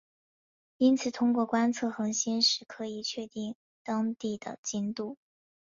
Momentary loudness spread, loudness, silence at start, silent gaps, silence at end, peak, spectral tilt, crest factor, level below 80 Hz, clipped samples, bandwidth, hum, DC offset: 13 LU; -30 LUFS; 0.8 s; 3.55-3.85 s, 4.58-4.63 s; 0.55 s; -12 dBFS; -3 dB/octave; 18 dB; -76 dBFS; under 0.1%; 7.6 kHz; none; under 0.1%